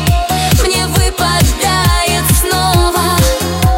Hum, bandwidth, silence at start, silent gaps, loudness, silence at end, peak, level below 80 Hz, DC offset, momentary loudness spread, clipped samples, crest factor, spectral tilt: none; 16.5 kHz; 0 s; none; -11 LUFS; 0 s; 0 dBFS; -18 dBFS; under 0.1%; 2 LU; under 0.1%; 10 dB; -4 dB/octave